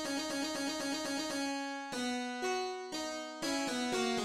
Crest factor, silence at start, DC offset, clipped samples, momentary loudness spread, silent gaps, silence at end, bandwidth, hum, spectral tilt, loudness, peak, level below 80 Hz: 14 dB; 0 s; under 0.1%; under 0.1%; 5 LU; none; 0 s; 16 kHz; none; -2 dB/octave; -36 LUFS; -22 dBFS; -70 dBFS